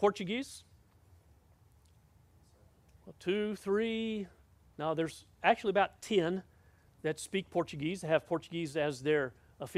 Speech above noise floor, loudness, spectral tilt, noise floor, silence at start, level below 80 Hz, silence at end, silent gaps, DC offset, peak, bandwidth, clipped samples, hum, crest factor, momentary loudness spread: 31 dB; -34 LUFS; -5 dB/octave; -64 dBFS; 0 s; -68 dBFS; 0 s; none; under 0.1%; -12 dBFS; 14.5 kHz; under 0.1%; none; 24 dB; 10 LU